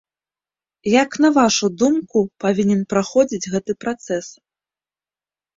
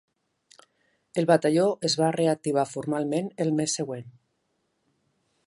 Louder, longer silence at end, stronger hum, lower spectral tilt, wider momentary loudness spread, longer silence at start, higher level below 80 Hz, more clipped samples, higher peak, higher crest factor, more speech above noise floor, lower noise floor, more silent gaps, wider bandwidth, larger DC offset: first, -18 LUFS vs -25 LUFS; about the same, 1.25 s vs 1.35 s; neither; about the same, -4.5 dB/octave vs -5 dB/octave; about the same, 11 LU vs 9 LU; second, 0.85 s vs 1.15 s; first, -58 dBFS vs -74 dBFS; neither; first, -2 dBFS vs -6 dBFS; about the same, 18 dB vs 20 dB; first, over 72 dB vs 50 dB; first, under -90 dBFS vs -75 dBFS; neither; second, 7.8 kHz vs 11.5 kHz; neither